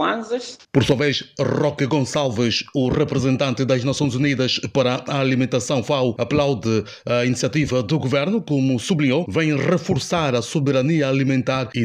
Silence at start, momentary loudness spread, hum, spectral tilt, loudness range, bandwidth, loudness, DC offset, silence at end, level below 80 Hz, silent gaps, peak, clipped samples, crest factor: 0 s; 3 LU; none; -5.5 dB/octave; 1 LU; 12 kHz; -20 LUFS; under 0.1%; 0 s; -50 dBFS; none; -4 dBFS; under 0.1%; 16 dB